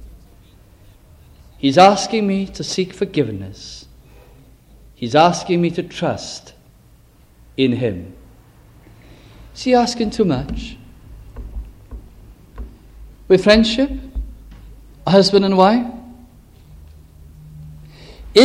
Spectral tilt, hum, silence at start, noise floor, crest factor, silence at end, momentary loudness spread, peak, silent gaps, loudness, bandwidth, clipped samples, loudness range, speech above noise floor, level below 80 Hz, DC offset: -5.5 dB/octave; none; 0.05 s; -49 dBFS; 20 dB; 0 s; 27 LU; 0 dBFS; none; -16 LUFS; 13 kHz; under 0.1%; 8 LU; 33 dB; -38 dBFS; under 0.1%